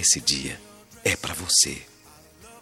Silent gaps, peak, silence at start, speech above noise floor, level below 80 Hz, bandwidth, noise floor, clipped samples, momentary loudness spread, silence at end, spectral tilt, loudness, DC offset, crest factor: none; -4 dBFS; 0 s; 28 dB; -52 dBFS; 18 kHz; -52 dBFS; under 0.1%; 17 LU; 0 s; -0.5 dB/octave; -22 LUFS; under 0.1%; 22 dB